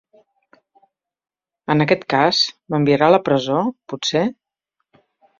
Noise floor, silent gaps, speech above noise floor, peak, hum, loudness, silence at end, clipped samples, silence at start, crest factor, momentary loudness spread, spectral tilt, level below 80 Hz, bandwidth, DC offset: -77 dBFS; none; 59 dB; -2 dBFS; none; -18 LUFS; 1.05 s; under 0.1%; 1.7 s; 18 dB; 10 LU; -5 dB/octave; -60 dBFS; 7.6 kHz; under 0.1%